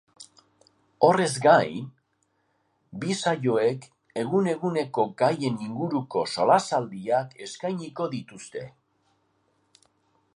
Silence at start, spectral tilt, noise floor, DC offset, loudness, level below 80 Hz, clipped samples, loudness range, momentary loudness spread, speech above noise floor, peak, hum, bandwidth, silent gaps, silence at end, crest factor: 0.2 s; -5.5 dB/octave; -72 dBFS; under 0.1%; -25 LUFS; -72 dBFS; under 0.1%; 6 LU; 17 LU; 47 dB; -4 dBFS; none; 11.5 kHz; none; 1.65 s; 24 dB